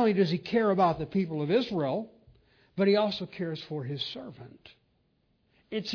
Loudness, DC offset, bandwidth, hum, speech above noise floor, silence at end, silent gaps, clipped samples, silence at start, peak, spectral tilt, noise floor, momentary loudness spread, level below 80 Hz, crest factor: -29 LUFS; under 0.1%; 5.4 kHz; none; 43 dB; 0 s; none; under 0.1%; 0 s; -12 dBFS; -7.5 dB/octave; -71 dBFS; 17 LU; -64 dBFS; 18 dB